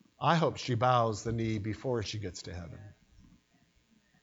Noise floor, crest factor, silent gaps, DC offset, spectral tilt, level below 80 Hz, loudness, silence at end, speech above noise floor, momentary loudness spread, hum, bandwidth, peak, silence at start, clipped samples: -69 dBFS; 22 dB; none; under 0.1%; -6 dB/octave; -58 dBFS; -31 LUFS; 1.3 s; 38 dB; 17 LU; none; 8 kHz; -12 dBFS; 0.2 s; under 0.1%